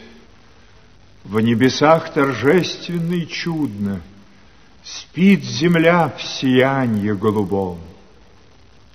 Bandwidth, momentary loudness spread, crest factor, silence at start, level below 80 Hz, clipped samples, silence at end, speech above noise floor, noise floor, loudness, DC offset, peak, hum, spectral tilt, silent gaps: 15.5 kHz; 11 LU; 18 dB; 0 s; -52 dBFS; under 0.1%; 1 s; 32 dB; -49 dBFS; -17 LUFS; 0.4%; 0 dBFS; none; -6 dB/octave; none